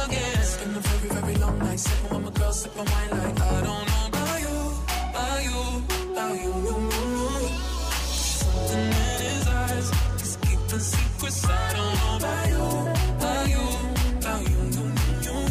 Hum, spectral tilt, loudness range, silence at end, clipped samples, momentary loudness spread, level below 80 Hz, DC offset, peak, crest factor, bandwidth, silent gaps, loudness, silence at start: none; -4.5 dB/octave; 2 LU; 0 s; under 0.1%; 4 LU; -28 dBFS; under 0.1%; -12 dBFS; 12 dB; 16 kHz; none; -26 LUFS; 0 s